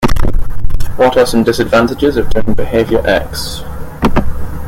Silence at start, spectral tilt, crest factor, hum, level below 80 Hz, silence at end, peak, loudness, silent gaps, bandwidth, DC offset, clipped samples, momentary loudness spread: 0 s; -5.5 dB/octave; 10 dB; none; -18 dBFS; 0 s; 0 dBFS; -14 LUFS; none; 15.5 kHz; under 0.1%; 0.1%; 12 LU